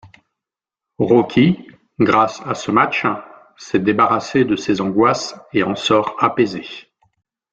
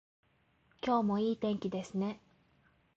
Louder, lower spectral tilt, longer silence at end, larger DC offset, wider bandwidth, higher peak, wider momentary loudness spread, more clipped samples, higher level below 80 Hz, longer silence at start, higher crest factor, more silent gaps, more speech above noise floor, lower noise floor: first, -17 LUFS vs -34 LUFS; about the same, -5.5 dB/octave vs -6 dB/octave; about the same, 0.75 s vs 0.8 s; neither; about the same, 8 kHz vs 7.8 kHz; first, 0 dBFS vs -20 dBFS; about the same, 9 LU vs 9 LU; neither; first, -56 dBFS vs -70 dBFS; second, 0.05 s vs 0.85 s; about the same, 18 dB vs 16 dB; neither; first, 70 dB vs 38 dB; first, -87 dBFS vs -71 dBFS